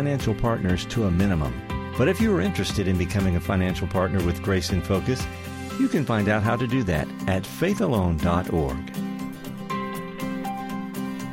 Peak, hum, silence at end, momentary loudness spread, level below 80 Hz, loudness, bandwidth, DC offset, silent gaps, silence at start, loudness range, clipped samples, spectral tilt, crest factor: -10 dBFS; none; 0 s; 9 LU; -38 dBFS; -25 LUFS; 16.5 kHz; under 0.1%; none; 0 s; 3 LU; under 0.1%; -6.5 dB/octave; 14 dB